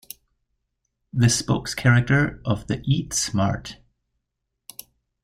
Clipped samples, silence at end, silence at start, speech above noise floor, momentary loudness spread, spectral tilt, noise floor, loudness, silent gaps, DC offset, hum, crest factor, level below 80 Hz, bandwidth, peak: under 0.1%; 1.5 s; 1.15 s; 59 dB; 22 LU; -4.5 dB/octave; -80 dBFS; -22 LUFS; none; under 0.1%; none; 20 dB; -48 dBFS; 15.5 kHz; -4 dBFS